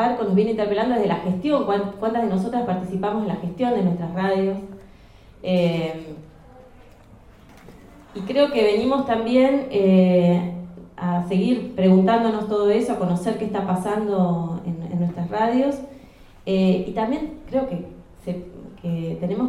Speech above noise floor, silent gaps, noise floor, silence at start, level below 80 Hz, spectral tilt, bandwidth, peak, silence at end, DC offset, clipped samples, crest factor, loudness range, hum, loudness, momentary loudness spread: 27 dB; none; -48 dBFS; 0 s; -50 dBFS; -8 dB/octave; 11.5 kHz; -4 dBFS; 0 s; under 0.1%; under 0.1%; 18 dB; 7 LU; none; -21 LUFS; 15 LU